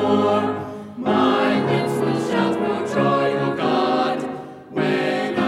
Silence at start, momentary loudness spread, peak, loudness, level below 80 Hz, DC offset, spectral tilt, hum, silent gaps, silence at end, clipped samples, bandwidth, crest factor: 0 s; 9 LU; -6 dBFS; -20 LUFS; -62 dBFS; under 0.1%; -6.5 dB/octave; none; none; 0 s; under 0.1%; 14.5 kHz; 14 dB